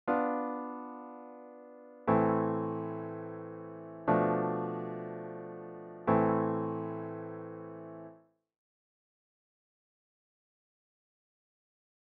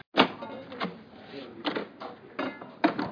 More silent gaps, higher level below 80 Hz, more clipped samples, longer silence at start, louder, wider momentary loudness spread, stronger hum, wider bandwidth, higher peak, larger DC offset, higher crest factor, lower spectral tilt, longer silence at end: neither; about the same, -70 dBFS vs -70 dBFS; neither; about the same, 0.05 s vs 0.15 s; about the same, -34 LUFS vs -32 LUFS; about the same, 19 LU vs 18 LU; neither; second, 4.5 kHz vs 5.4 kHz; second, -14 dBFS vs -6 dBFS; neither; about the same, 22 dB vs 26 dB; first, -8.5 dB/octave vs -6 dB/octave; first, 3.85 s vs 0 s